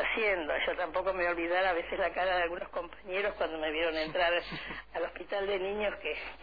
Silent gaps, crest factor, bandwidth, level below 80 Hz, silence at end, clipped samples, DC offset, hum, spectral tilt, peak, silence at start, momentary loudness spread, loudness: none; 16 dB; 5 kHz; -56 dBFS; 0 s; under 0.1%; 0.2%; none; -6 dB/octave; -16 dBFS; 0 s; 8 LU; -32 LUFS